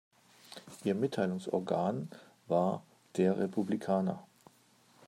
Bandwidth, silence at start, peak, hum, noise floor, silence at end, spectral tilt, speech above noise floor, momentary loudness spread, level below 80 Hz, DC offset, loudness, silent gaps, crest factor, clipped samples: 13 kHz; 0.5 s; -16 dBFS; none; -65 dBFS; 0.85 s; -7.5 dB/octave; 33 dB; 16 LU; -80 dBFS; under 0.1%; -34 LUFS; none; 18 dB; under 0.1%